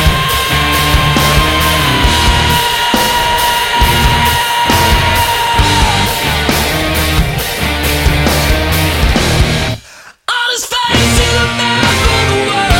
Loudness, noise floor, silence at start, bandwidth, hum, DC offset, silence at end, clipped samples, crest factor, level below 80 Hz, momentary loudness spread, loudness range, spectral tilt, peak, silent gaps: -10 LUFS; -36 dBFS; 0 s; 17 kHz; none; under 0.1%; 0 s; under 0.1%; 12 dB; -18 dBFS; 4 LU; 2 LU; -3.5 dB/octave; 0 dBFS; none